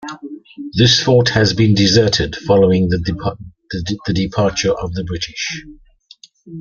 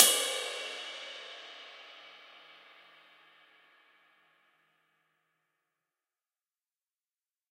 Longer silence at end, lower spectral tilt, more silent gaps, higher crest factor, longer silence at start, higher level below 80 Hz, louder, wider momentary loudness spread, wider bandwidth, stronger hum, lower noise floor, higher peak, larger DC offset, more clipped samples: second, 0 s vs 5.3 s; first, -5 dB/octave vs 2.5 dB/octave; neither; second, 16 dB vs 36 dB; about the same, 0 s vs 0 s; first, -40 dBFS vs under -90 dBFS; first, -15 LUFS vs -32 LUFS; second, 18 LU vs 24 LU; second, 7.4 kHz vs 15.5 kHz; neither; second, -46 dBFS vs under -90 dBFS; about the same, -2 dBFS vs -2 dBFS; neither; neither